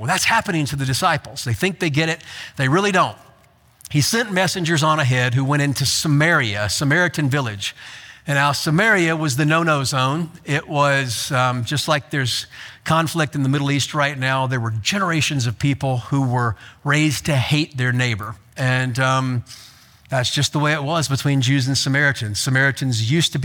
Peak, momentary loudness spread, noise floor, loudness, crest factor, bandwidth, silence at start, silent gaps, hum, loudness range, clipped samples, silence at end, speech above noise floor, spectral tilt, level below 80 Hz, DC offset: -2 dBFS; 7 LU; -53 dBFS; -19 LUFS; 18 dB; 19 kHz; 0 s; none; none; 3 LU; under 0.1%; 0 s; 34 dB; -4.5 dB/octave; -52 dBFS; under 0.1%